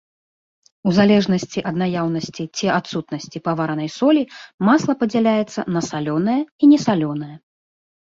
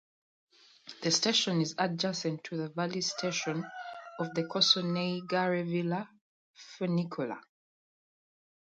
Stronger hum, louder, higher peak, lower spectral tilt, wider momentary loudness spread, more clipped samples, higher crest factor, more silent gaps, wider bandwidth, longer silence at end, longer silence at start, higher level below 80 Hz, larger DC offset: neither; first, -19 LUFS vs -31 LUFS; first, -2 dBFS vs -12 dBFS; first, -6 dB/octave vs -4 dB/octave; second, 12 LU vs 17 LU; neither; about the same, 18 dB vs 22 dB; second, 4.54-4.58 s, 6.52-6.59 s vs 6.21-6.54 s; second, 7.6 kHz vs 9.2 kHz; second, 0.65 s vs 1.25 s; about the same, 0.85 s vs 0.85 s; first, -58 dBFS vs -80 dBFS; neither